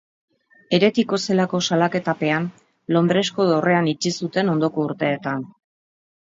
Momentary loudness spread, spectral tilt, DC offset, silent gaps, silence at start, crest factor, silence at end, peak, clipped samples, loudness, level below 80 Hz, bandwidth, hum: 8 LU; -5.5 dB/octave; under 0.1%; none; 0.7 s; 18 dB; 0.85 s; -4 dBFS; under 0.1%; -20 LUFS; -66 dBFS; 7.8 kHz; none